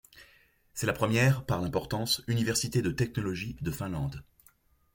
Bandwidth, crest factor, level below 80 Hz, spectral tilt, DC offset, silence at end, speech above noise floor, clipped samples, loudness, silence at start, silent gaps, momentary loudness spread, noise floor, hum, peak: 17 kHz; 18 dB; -52 dBFS; -5 dB/octave; under 0.1%; 0.75 s; 35 dB; under 0.1%; -30 LUFS; 0.15 s; none; 10 LU; -64 dBFS; none; -14 dBFS